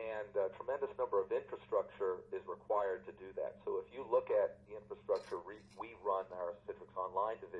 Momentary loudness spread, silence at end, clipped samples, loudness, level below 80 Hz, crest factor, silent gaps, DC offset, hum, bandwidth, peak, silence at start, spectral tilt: 13 LU; 0 s; under 0.1%; -40 LUFS; -74 dBFS; 18 dB; none; under 0.1%; none; 7.4 kHz; -22 dBFS; 0 s; -6.5 dB/octave